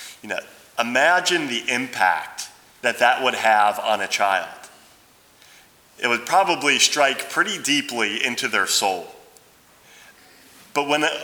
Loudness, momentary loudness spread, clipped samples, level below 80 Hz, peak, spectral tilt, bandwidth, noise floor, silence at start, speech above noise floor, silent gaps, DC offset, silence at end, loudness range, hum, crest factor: -20 LUFS; 13 LU; under 0.1%; -72 dBFS; -2 dBFS; -1 dB/octave; over 20 kHz; -53 dBFS; 0 s; 33 dB; none; under 0.1%; 0 s; 4 LU; none; 20 dB